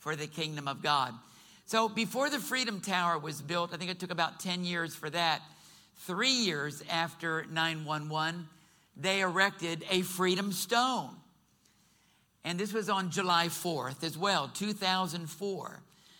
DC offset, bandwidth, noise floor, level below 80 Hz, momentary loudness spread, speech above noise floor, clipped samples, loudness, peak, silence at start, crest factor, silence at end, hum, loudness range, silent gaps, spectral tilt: under 0.1%; 19.5 kHz; -69 dBFS; -76 dBFS; 9 LU; 36 dB; under 0.1%; -32 LUFS; -12 dBFS; 0 s; 22 dB; 0.35 s; none; 2 LU; none; -3.5 dB/octave